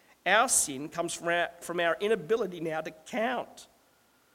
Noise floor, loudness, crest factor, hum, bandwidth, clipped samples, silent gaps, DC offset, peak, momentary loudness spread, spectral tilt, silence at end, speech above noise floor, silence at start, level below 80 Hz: -66 dBFS; -29 LUFS; 22 dB; none; 16.5 kHz; under 0.1%; none; under 0.1%; -10 dBFS; 12 LU; -2 dB/octave; 0.7 s; 36 dB; 0.25 s; -68 dBFS